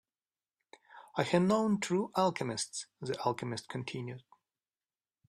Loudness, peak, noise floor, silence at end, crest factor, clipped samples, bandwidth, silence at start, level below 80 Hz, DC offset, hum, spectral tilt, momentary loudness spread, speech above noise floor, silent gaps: -33 LUFS; -14 dBFS; under -90 dBFS; 1.1 s; 22 dB; under 0.1%; 14 kHz; 0.95 s; -74 dBFS; under 0.1%; none; -5 dB/octave; 12 LU; over 57 dB; none